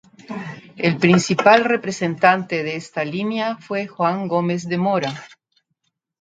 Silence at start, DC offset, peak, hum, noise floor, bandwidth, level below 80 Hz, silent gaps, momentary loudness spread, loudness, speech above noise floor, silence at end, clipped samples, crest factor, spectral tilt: 0.3 s; under 0.1%; 0 dBFS; none; -73 dBFS; 9.2 kHz; -62 dBFS; none; 17 LU; -19 LUFS; 54 dB; 0.95 s; under 0.1%; 20 dB; -5.5 dB/octave